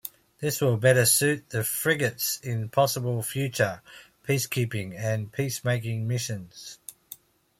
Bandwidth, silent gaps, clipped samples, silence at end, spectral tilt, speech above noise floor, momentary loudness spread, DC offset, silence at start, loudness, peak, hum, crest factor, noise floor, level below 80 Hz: 16.5 kHz; none; under 0.1%; 0.45 s; -4 dB/octave; 24 dB; 21 LU; under 0.1%; 0.05 s; -26 LUFS; -6 dBFS; none; 20 dB; -50 dBFS; -64 dBFS